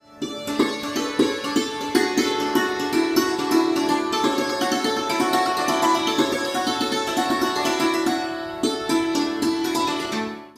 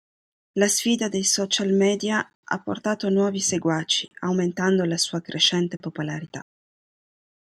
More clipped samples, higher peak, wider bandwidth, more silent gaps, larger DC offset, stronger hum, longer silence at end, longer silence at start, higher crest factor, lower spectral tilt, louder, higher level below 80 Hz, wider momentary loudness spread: neither; about the same, -4 dBFS vs -6 dBFS; about the same, 15.5 kHz vs 15 kHz; second, none vs 2.35-2.43 s; neither; neither; second, 0.05 s vs 1.15 s; second, 0.1 s vs 0.55 s; about the same, 18 dB vs 18 dB; about the same, -3 dB/octave vs -3.5 dB/octave; about the same, -22 LUFS vs -23 LUFS; first, -58 dBFS vs -68 dBFS; second, 5 LU vs 11 LU